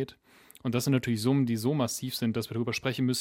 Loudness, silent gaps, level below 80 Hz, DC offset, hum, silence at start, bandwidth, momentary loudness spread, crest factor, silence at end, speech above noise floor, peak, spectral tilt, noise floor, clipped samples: -29 LUFS; none; -66 dBFS; under 0.1%; none; 0 s; 16.5 kHz; 5 LU; 16 dB; 0 s; 29 dB; -12 dBFS; -5.5 dB/octave; -57 dBFS; under 0.1%